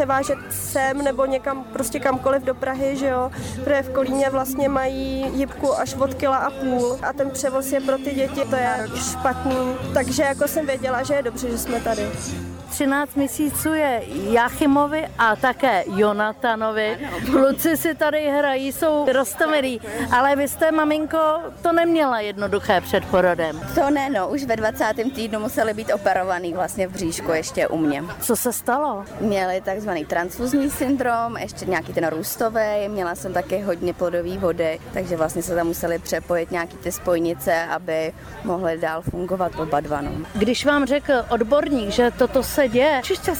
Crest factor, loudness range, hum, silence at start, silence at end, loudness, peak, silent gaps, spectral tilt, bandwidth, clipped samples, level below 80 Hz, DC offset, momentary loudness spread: 14 dB; 4 LU; none; 0 s; 0 s; -22 LUFS; -8 dBFS; none; -4.5 dB/octave; over 20 kHz; under 0.1%; -44 dBFS; under 0.1%; 7 LU